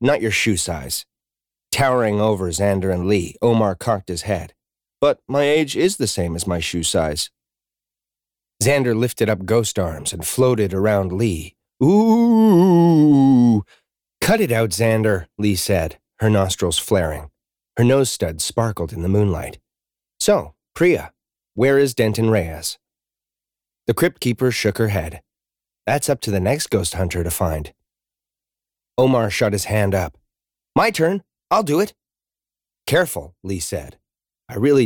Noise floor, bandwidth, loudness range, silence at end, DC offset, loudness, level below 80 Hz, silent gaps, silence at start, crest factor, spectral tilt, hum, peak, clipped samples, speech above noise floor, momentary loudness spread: under -90 dBFS; over 20 kHz; 7 LU; 0 s; under 0.1%; -19 LUFS; -42 dBFS; none; 0 s; 14 dB; -5.5 dB/octave; none; -6 dBFS; under 0.1%; over 72 dB; 12 LU